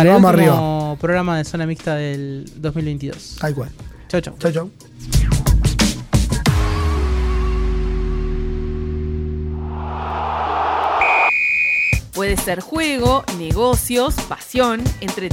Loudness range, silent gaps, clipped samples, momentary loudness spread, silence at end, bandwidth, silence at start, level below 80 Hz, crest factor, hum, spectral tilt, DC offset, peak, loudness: 7 LU; none; under 0.1%; 12 LU; 0 s; 17 kHz; 0 s; -24 dBFS; 16 dB; none; -5.5 dB/octave; under 0.1%; -2 dBFS; -18 LUFS